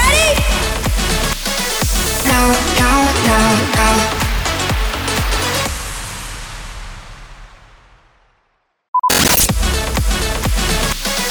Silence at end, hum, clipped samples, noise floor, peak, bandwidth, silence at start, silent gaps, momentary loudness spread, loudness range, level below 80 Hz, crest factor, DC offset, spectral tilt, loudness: 0 s; none; under 0.1%; -64 dBFS; -2 dBFS; over 20 kHz; 0 s; 8.88-8.93 s; 14 LU; 10 LU; -22 dBFS; 14 dB; under 0.1%; -3 dB/octave; -15 LUFS